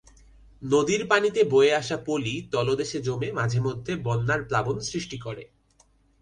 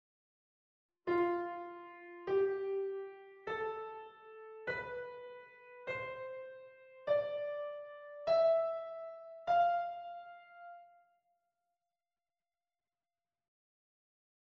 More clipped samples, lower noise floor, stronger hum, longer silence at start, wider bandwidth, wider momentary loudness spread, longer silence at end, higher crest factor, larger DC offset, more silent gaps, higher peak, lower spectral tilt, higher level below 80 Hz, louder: neither; second, -62 dBFS vs under -90 dBFS; neither; second, 0.6 s vs 1.05 s; first, 10.5 kHz vs 6.2 kHz; second, 12 LU vs 22 LU; second, 0.75 s vs 3.6 s; about the same, 20 dB vs 18 dB; neither; neither; first, -6 dBFS vs -22 dBFS; second, -5 dB/octave vs -6.5 dB/octave; first, -54 dBFS vs -80 dBFS; first, -25 LUFS vs -37 LUFS